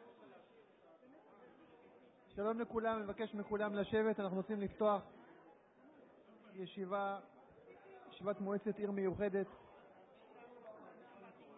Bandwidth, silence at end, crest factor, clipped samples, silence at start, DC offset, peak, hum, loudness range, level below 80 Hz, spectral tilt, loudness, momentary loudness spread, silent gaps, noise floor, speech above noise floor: 3.9 kHz; 0 s; 20 dB; under 0.1%; 0 s; under 0.1%; -24 dBFS; none; 6 LU; -72 dBFS; -3.5 dB/octave; -41 LUFS; 25 LU; none; -66 dBFS; 26 dB